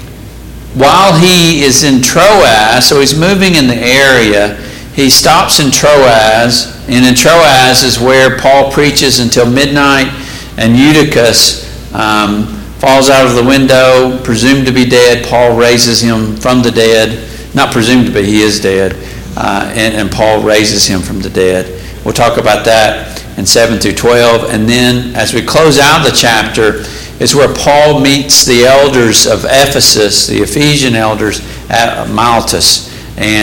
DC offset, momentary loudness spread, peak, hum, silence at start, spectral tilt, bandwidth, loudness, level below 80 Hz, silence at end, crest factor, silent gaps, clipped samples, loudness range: under 0.1%; 9 LU; 0 dBFS; none; 0 s; -3.5 dB/octave; over 20 kHz; -6 LUFS; -28 dBFS; 0 s; 8 dB; none; 0.7%; 4 LU